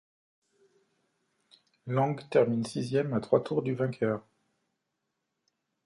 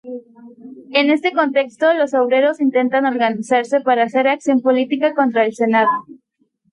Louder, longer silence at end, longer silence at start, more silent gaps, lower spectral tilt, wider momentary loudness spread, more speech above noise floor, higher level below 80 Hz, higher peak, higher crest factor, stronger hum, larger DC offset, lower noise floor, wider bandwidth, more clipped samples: second, -29 LUFS vs -16 LUFS; first, 1.65 s vs 0.6 s; first, 1.85 s vs 0.05 s; neither; first, -7.5 dB/octave vs -5 dB/octave; first, 6 LU vs 3 LU; first, 55 dB vs 48 dB; about the same, -72 dBFS vs -72 dBFS; second, -10 dBFS vs -4 dBFS; first, 22 dB vs 14 dB; neither; neither; first, -83 dBFS vs -64 dBFS; about the same, 11.5 kHz vs 11 kHz; neither